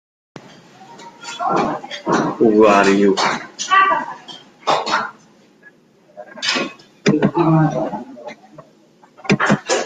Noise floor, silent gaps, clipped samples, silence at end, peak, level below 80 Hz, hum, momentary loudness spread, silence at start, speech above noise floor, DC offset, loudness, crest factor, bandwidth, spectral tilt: -50 dBFS; none; under 0.1%; 0 s; -2 dBFS; -58 dBFS; none; 19 LU; 0.8 s; 36 dB; under 0.1%; -17 LUFS; 18 dB; 9.4 kHz; -5 dB/octave